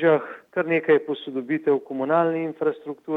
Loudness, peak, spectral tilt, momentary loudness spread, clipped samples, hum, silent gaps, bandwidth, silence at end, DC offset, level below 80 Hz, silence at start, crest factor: -23 LUFS; -6 dBFS; -8.5 dB/octave; 9 LU; under 0.1%; none; none; 4 kHz; 0 s; under 0.1%; -80 dBFS; 0 s; 16 dB